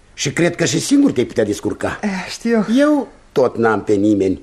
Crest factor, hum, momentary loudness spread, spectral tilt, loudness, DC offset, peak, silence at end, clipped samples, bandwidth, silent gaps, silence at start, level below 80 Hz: 14 dB; none; 8 LU; -5 dB/octave; -17 LUFS; under 0.1%; -2 dBFS; 0 s; under 0.1%; 13.5 kHz; none; 0.15 s; -48 dBFS